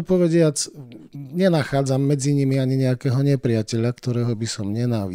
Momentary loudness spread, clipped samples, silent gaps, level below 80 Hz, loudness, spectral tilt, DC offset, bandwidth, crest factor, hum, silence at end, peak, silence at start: 9 LU; under 0.1%; none; -54 dBFS; -21 LUFS; -6.5 dB/octave; under 0.1%; 15.5 kHz; 14 dB; none; 0 s; -6 dBFS; 0 s